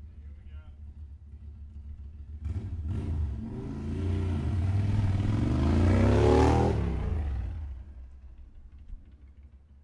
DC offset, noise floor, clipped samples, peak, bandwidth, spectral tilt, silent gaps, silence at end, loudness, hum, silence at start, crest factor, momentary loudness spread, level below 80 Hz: under 0.1%; -52 dBFS; under 0.1%; -10 dBFS; 10.5 kHz; -8 dB/octave; none; 0.25 s; -28 LUFS; none; 0 s; 18 dB; 24 LU; -36 dBFS